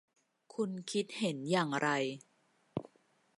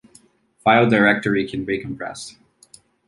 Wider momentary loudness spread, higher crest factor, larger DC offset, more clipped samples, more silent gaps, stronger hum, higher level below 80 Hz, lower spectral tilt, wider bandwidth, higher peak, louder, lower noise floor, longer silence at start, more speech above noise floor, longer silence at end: second, 12 LU vs 17 LU; about the same, 20 dB vs 18 dB; neither; neither; neither; neither; second, -78 dBFS vs -54 dBFS; about the same, -5 dB/octave vs -6 dB/octave; about the same, 11.5 kHz vs 11.5 kHz; second, -18 dBFS vs -2 dBFS; second, -36 LUFS vs -19 LUFS; first, -72 dBFS vs -54 dBFS; about the same, 0.55 s vs 0.65 s; about the same, 37 dB vs 36 dB; second, 0.55 s vs 0.75 s